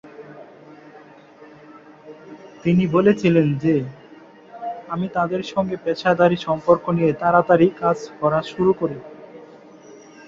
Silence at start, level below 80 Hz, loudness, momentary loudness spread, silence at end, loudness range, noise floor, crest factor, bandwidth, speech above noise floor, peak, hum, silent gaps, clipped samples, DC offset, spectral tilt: 0.05 s; -56 dBFS; -19 LUFS; 20 LU; 0.35 s; 4 LU; -45 dBFS; 18 dB; 7.4 kHz; 27 dB; -2 dBFS; none; none; under 0.1%; under 0.1%; -8 dB/octave